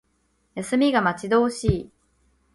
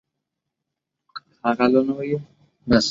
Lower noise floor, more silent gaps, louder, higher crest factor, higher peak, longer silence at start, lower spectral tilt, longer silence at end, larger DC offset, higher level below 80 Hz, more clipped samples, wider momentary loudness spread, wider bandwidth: second, -68 dBFS vs -82 dBFS; neither; about the same, -22 LUFS vs -21 LUFS; about the same, 18 dB vs 20 dB; about the same, -6 dBFS vs -4 dBFS; second, 0.55 s vs 1.15 s; about the same, -6 dB/octave vs -5 dB/octave; first, 0.7 s vs 0 s; neither; first, -42 dBFS vs -50 dBFS; neither; second, 12 LU vs 22 LU; first, 11.5 kHz vs 7.8 kHz